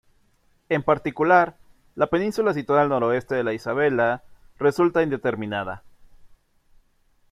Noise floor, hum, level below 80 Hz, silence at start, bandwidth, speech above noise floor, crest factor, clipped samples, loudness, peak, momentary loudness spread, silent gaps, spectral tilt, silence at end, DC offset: -63 dBFS; none; -56 dBFS; 0.7 s; 14 kHz; 41 dB; 20 dB; under 0.1%; -22 LUFS; -4 dBFS; 10 LU; none; -7 dB/octave; 1.05 s; under 0.1%